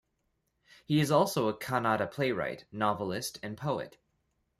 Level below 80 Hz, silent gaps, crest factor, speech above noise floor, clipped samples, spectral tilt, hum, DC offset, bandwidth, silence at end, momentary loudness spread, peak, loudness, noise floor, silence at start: -68 dBFS; none; 20 dB; 48 dB; under 0.1%; -5.5 dB/octave; none; under 0.1%; 15.5 kHz; 0.7 s; 11 LU; -12 dBFS; -31 LUFS; -79 dBFS; 0.9 s